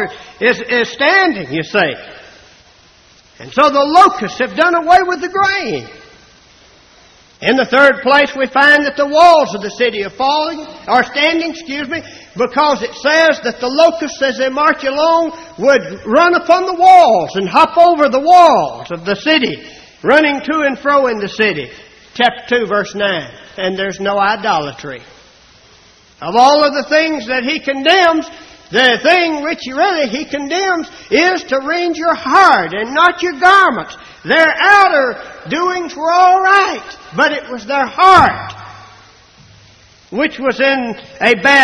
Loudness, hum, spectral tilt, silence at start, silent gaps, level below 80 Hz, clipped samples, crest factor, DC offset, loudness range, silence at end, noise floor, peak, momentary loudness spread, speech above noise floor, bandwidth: -12 LUFS; none; -3.5 dB/octave; 0 s; none; -50 dBFS; 0.1%; 12 dB; under 0.1%; 6 LU; 0 s; -46 dBFS; 0 dBFS; 13 LU; 34 dB; 11 kHz